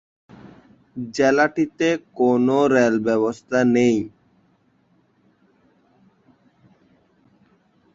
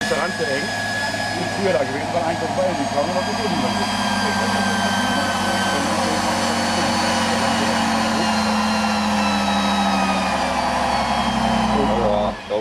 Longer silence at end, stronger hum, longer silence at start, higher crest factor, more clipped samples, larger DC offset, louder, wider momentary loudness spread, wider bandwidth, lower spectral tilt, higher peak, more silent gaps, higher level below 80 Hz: first, 3.85 s vs 0 s; neither; first, 0.95 s vs 0 s; about the same, 18 dB vs 14 dB; neither; neither; about the same, -19 LUFS vs -20 LUFS; first, 11 LU vs 3 LU; second, 7.8 kHz vs 14 kHz; first, -6 dB/octave vs -4 dB/octave; about the same, -4 dBFS vs -6 dBFS; neither; second, -62 dBFS vs -42 dBFS